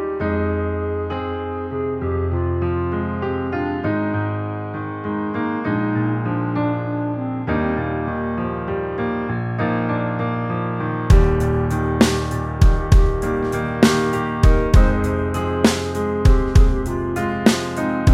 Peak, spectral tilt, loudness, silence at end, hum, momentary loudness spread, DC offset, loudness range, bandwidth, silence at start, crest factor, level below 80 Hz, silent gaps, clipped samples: 0 dBFS; -6.5 dB/octave; -20 LUFS; 0 s; none; 8 LU; under 0.1%; 5 LU; 14 kHz; 0 s; 18 dB; -24 dBFS; none; under 0.1%